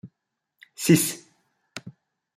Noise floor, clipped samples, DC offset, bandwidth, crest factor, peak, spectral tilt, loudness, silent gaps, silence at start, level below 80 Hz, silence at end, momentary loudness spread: -80 dBFS; under 0.1%; under 0.1%; 16 kHz; 22 dB; -4 dBFS; -4.5 dB/octave; -22 LUFS; none; 0.05 s; -68 dBFS; 0.45 s; 22 LU